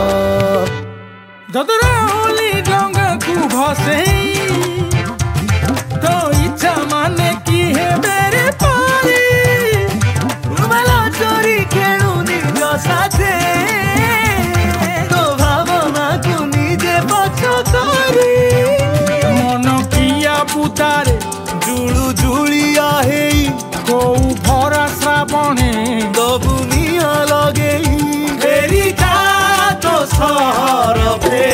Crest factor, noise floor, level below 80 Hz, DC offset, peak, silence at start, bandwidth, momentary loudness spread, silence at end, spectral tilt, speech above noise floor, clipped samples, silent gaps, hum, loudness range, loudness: 12 dB; -35 dBFS; -26 dBFS; under 0.1%; 0 dBFS; 0 s; 16.5 kHz; 5 LU; 0 s; -4.5 dB/octave; 23 dB; under 0.1%; none; none; 2 LU; -13 LUFS